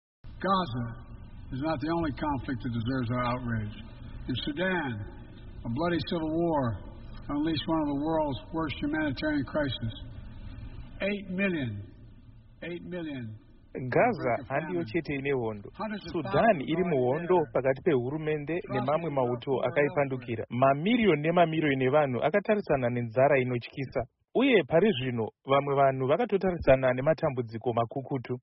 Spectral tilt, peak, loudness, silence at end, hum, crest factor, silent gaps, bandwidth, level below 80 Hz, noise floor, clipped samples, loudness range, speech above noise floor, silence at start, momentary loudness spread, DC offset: -5 dB/octave; -10 dBFS; -29 LUFS; 0.05 s; none; 18 dB; none; 5.6 kHz; -48 dBFS; -52 dBFS; under 0.1%; 7 LU; 24 dB; 0.25 s; 16 LU; under 0.1%